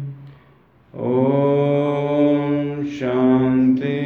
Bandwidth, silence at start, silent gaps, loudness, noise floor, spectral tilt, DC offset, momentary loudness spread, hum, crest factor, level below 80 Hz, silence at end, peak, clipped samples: 6.6 kHz; 0 s; none; -18 LUFS; -52 dBFS; -9.5 dB/octave; under 0.1%; 8 LU; none; 14 dB; -56 dBFS; 0 s; -6 dBFS; under 0.1%